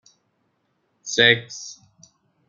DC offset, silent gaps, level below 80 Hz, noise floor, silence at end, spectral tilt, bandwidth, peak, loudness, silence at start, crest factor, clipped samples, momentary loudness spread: under 0.1%; none; -68 dBFS; -70 dBFS; 0.75 s; -2.5 dB/octave; 7.6 kHz; 0 dBFS; -18 LUFS; 1.05 s; 24 dB; under 0.1%; 23 LU